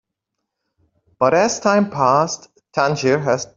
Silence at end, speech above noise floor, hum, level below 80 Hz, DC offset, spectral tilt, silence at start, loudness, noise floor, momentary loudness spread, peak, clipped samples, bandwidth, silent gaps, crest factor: 0.1 s; 62 dB; none; -60 dBFS; under 0.1%; -4.5 dB/octave; 1.2 s; -17 LUFS; -79 dBFS; 7 LU; -2 dBFS; under 0.1%; 7.8 kHz; none; 18 dB